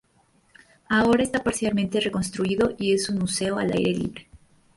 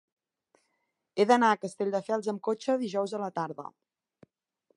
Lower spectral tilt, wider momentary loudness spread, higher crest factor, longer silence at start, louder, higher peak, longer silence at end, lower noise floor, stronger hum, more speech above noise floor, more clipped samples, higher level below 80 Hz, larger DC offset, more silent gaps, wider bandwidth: about the same, -4.5 dB/octave vs -5 dB/octave; second, 6 LU vs 15 LU; second, 16 dB vs 22 dB; second, 0.9 s vs 1.15 s; first, -24 LUFS vs -29 LUFS; about the same, -8 dBFS vs -8 dBFS; second, 0.4 s vs 1.1 s; second, -63 dBFS vs -80 dBFS; neither; second, 39 dB vs 51 dB; neither; first, -52 dBFS vs -84 dBFS; neither; neither; about the same, 11.5 kHz vs 11.5 kHz